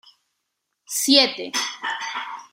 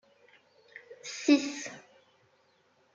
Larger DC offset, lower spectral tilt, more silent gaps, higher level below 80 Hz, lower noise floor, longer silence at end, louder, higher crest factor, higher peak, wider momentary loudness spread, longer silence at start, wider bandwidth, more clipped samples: neither; second, 0 dB/octave vs -2.5 dB/octave; neither; first, -76 dBFS vs -88 dBFS; first, -78 dBFS vs -68 dBFS; second, 0.05 s vs 1.15 s; first, -20 LUFS vs -30 LUFS; about the same, 24 dB vs 24 dB; first, 0 dBFS vs -12 dBFS; second, 13 LU vs 26 LU; first, 0.9 s vs 0.75 s; first, 16 kHz vs 7.6 kHz; neither